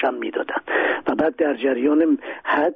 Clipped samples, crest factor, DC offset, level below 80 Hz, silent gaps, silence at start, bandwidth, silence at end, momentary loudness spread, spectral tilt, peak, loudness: under 0.1%; 14 dB; under 0.1%; -62 dBFS; none; 0 s; 4.7 kHz; 0 s; 6 LU; -2.5 dB/octave; -8 dBFS; -21 LUFS